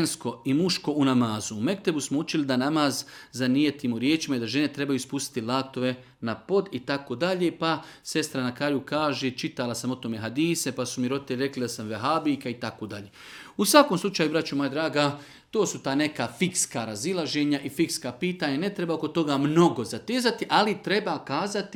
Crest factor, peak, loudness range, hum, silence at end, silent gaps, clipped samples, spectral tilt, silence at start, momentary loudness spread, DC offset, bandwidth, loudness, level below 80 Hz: 24 dB; -2 dBFS; 3 LU; none; 0 s; none; under 0.1%; -4.5 dB/octave; 0 s; 8 LU; under 0.1%; 18.5 kHz; -26 LUFS; -68 dBFS